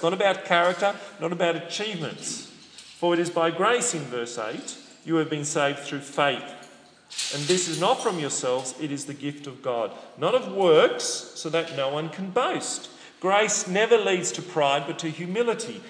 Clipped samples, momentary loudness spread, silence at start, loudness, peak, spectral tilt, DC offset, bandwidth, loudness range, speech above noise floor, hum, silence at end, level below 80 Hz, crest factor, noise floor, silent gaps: under 0.1%; 12 LU; 0 s; -25 LUFS; -4 dBFS; -3 dB/octave; under 0.1%; 10.5 kHz; 3 LU; 25 dB; none; 0 s; -80 dBFS; 22 dB; -50 dBFS; none